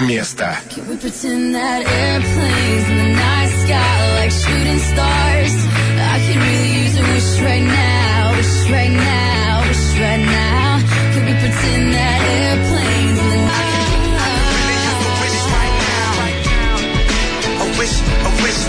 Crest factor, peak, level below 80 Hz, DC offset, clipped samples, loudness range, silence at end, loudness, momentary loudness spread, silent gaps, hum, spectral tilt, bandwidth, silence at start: 10 dB; -4 dBFS; -22 dBFS; under 0.1%; under 0.1%; 2 LU; 0 s; -15 LUFS; 3 LU; none; none; -4.5 dB/octave; 11 kHz; 0 s